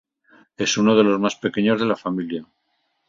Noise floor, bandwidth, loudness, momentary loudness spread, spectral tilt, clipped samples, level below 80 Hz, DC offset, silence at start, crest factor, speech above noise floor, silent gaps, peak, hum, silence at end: -71 dBFS; 7.6 kHz; -20 LUFS; 11 LU; -4.5 dB/octave; under 0.1%; -60 dBFS; under 0.1%; 0.6 s; 20 dB; 51 dB; none; -2 dBFS; none; 0.65 s